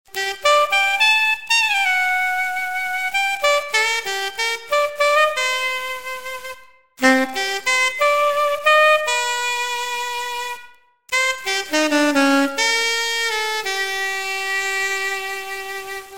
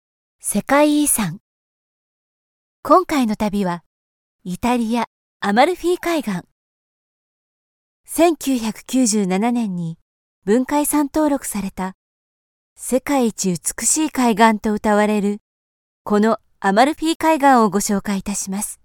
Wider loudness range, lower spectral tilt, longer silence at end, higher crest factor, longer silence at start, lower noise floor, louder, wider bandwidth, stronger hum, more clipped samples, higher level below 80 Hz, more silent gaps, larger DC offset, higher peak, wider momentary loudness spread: about the same, 3 LU vs 4 LU; second, 0 dB/octave vs -4 dB/octave; about the same, 0 s vs 0.1 s; about the same, 18 dB vs 18 dB; second, 0.05 s vs 0.45 s; second, -47 dBFS vs under -90 dBFS; about the same, -18 LUFS vs -18 LUFS; second, 17 kHz vs 19 kHz; neither; neither; second, -60 dBFS vs -48 dBFS; second, none vs 1.40-2.83 s, 3.86-4.39 s, 5.07-5.40 s, 6.52-8.04 s, 10.01-10.42 s, 11.94-12.76 s, 15.41-16.05 s, 17.15-17.20 s; first, 0.8% vs under 0.1%; about the same, -2 dBFS vs -2 dBFS; about the same, 11 LU vs 13 LU